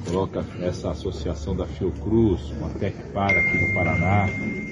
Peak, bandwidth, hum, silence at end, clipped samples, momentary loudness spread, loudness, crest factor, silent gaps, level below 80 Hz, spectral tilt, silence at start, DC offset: -8 dBFS; 10.5 kHz; none; 0 s; under 0.1%; 10 LU; -24 LUFS; 16 dB; none; -38 dBFS; -7 dB/octave; 0 s; under 0.1%